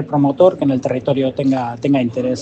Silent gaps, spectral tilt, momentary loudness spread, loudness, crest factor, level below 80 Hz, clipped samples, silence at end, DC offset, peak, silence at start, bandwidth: none; -8 dB/octave; 6 LU; -16 LUFS; 16 dB; -56 dBFS; under 0.1%; 0 s; under 0.1%; 0 dBFS; 0 s; 8 kHz